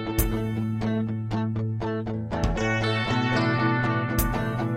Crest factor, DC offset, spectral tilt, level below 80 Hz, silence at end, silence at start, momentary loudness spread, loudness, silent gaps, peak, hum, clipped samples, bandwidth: 16 dB; under 0.1%; -6 dB/octave; -36 dBFS; 0 s; 0 s; 5 LU; -26 LUFS; none; -10 dBFS; none; under 0.1%; 17 kHz